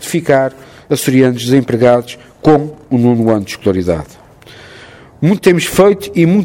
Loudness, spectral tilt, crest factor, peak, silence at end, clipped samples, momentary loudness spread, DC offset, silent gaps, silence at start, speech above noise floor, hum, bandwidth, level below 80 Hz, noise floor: -12 LUFS; -6 dB/octave; 12 dB; 0 dBFS; 0 s; 0.1%; 8 LU; under 0.1%; none; 0 s; 26 dB; none; 17.5 kHz; -42 dBFS; -37 dBFS